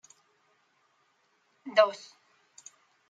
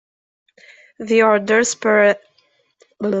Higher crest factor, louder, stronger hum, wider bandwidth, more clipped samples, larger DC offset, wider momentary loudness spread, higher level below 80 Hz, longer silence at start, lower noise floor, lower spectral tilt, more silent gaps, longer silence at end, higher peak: first, 26 dB vs 16 dB; second, -26 LUFS vs -16 LUFS; neither; about the same, 7.8 kHz vs 8.2 kHz; neither; neither; first, 27 LU vs 12 LU; second, under -90 dBFS vs -66 dBFS; first, 1.65 s vs 1 s; first, -71 dBFS vs -61 dBFS; second, -2 dB/octave vs -3.5 dB/octave; neither; first, 1.15 s vs 0 s; second, -8 dBFS vs -4 dBFS